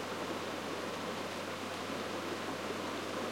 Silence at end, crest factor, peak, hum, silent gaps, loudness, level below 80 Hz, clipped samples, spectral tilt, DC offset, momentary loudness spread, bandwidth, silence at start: 0 s; 12 dB; -26 dBFS; none; none; -39 LUFS; -76 dBFS; under 0.1%; -3.5 dB/octave; under 0.1%; 1 LU; 16.5 kHz; 0 s